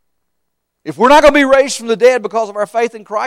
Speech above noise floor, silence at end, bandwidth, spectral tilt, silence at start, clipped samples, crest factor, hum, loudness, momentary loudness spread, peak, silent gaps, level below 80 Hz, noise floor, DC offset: 61 dB; 0 s; 14.5 kHz; -3 dB/octave; 0.85 s; under 0.1%; 12 dB; none; -11 LUFS; 11 LU; 0 dBFS; none; -42 dBFS; -72 dBFS; under 0.1%